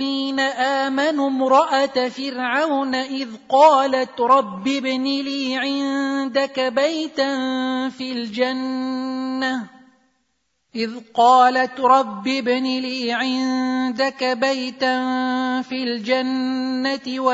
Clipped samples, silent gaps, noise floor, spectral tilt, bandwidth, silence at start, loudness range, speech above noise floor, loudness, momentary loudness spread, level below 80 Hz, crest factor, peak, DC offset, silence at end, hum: under 0.1%; none; -71 dBFS; -3.5 dB/octave; 7.8 kHz; 0 s; 5 LU; 51 dB; -20 LUFS; 9 LU; -72 dBFS; 18 dB; -2 dBFS; under 0.1%; 0 s; none